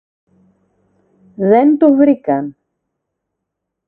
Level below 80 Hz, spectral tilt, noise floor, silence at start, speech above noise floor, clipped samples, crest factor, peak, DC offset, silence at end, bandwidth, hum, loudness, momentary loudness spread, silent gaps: -64 dBFS; -11 dB/octave; -77 dBFS; 1.4 s; 66 dB; under 0.1%; 16 dB; 0 dBFS; under 0.1%; 1.35 s; 3.4 kHz; none; -12 LUFS; 10 LU; none